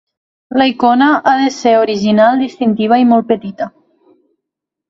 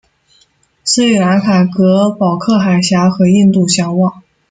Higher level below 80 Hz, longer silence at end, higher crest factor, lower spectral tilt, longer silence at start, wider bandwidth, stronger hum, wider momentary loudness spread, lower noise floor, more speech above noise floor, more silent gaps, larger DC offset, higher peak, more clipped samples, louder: about the same, -56 dBFS vs -52 dBFS; first, 1.2 s vs 0.3 s; about the same, 14 dB vs 12 dB; about the same, -5.5 dB/octave vs -5.5 dB/octave; second, 0.5 s vs 0.85 s; second, 7.6 kHz vs 9.4 kHz; neither; first, 9 LU vs 5 LU; first, -79 dBFS vs -53 dBFS; first, 68 dB vs 43 dB; neither; neither; about the same, 0 dBFS vs 0 dBFS; neither; about the same, -12 LUFS vs -11 LUFS